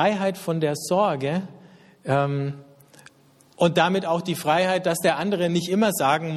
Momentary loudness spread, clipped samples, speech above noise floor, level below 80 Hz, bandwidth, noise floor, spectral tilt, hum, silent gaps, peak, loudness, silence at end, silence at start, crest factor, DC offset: 8 LU; under 0.1%; 34 dB; -64 dBFS; 14.5 kHz; -56 dBFS; -5 dB/octave; none; none; -4 dBFS; -23 LUFS; 0 s; 0 s; 18 dB; under 0.1%